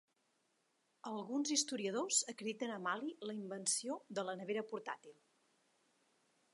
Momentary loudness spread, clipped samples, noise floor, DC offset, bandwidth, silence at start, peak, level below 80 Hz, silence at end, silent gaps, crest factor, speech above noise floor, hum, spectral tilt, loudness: 11 LU; under 0.1%; -81 dBFS; under 0.1%; 11.5 kHz; 1.05 s; -20 dBFS; under -90 dBFS; 1.4 s; none; 22 dB; 39 dB; none; -2 dB/octave; -40 LUFS